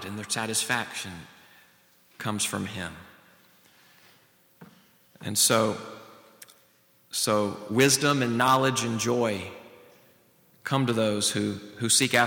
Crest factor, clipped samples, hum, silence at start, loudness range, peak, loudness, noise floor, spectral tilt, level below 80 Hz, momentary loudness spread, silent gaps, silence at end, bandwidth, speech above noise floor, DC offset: 22 dB; under 0.1%; none; 0 s; 11 LU; -6 dBFS; -25 LUFS; -62 dBFS; -3 dB/octave; -68 dBFS; 18 LU; none; 0 s; over 20 kHz; 37 dB; under 0.1%